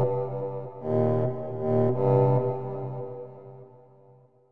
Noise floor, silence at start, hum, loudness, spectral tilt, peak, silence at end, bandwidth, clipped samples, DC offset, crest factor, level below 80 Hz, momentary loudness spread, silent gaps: -57 dBFS; 0 s; none; -27 LUFS; -12 dB/octave; -10 dBFS; 0 s; 3.5 kHz; under 0.1%; under 0.1%; 16 dB; -64 dBFS; 18 LU; none